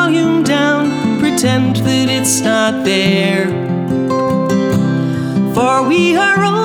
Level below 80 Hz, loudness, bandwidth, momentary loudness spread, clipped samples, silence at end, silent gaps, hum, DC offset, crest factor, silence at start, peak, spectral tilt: -48 dBFS; -13 LUFS; 19.5 kHz; 5 LU; under 0.1%; 0 s; none; none; under 0.1%; 12 dB; 0 s; -2 dBFS; -4.5 dB/octave